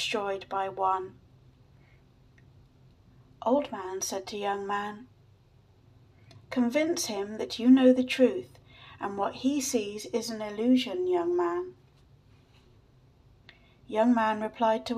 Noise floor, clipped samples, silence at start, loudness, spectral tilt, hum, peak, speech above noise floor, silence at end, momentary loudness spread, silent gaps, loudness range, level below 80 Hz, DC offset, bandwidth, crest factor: -60 dBFS; under 0.1%; 0 s; -28 LUFS; -4 dB/octave; none; -10 dBFS; 33 dB; 0 s; 12 LU; none; 8 LU; -66 dBFS; under 0.1%; 14.5 kHz; 20 dB